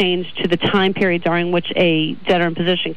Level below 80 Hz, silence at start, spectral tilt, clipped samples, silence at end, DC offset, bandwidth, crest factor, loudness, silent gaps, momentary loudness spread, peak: -50 dBFS; 0 s; -7 dB/octave; under 0.1%; 0 s; 3%; 6.8 kHz; 10 dB; -17 LUFS; none; 3 LU; -8 dBFS